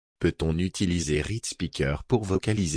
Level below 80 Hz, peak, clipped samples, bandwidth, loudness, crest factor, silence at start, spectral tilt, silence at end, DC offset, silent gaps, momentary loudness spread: -40 dBFS; -10 dBFS; under 0.1%; 10.5 kHz; -27 LUFS; 16 dB; 0.2 s; -5.5 dB/octave; 0 s; under 0.1%; none; 5 LU